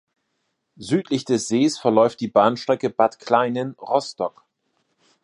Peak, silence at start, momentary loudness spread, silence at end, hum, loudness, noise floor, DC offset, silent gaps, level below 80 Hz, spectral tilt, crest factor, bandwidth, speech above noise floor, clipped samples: -2 dBFS; 0.8 s; 10 LU; 0.95 s; none; -21 LUFS; -74 dBFS; under 0.1%; none; -68 dBFS; -5 dB/octave; 20 dB; 11.5 kHz; 54 dB; under 0.1%